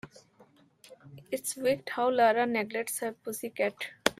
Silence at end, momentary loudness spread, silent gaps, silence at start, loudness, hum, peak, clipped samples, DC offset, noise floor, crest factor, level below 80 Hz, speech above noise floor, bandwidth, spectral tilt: 0.05 s; 12 LU; none; 0.05 s; -30 LUFS; none; -6 dBFS; under 0.1%; under 0.1%; -61 dBFS; 26 dB; -72 dBFS; 32 dB; 16 kHz; -3 dB/octave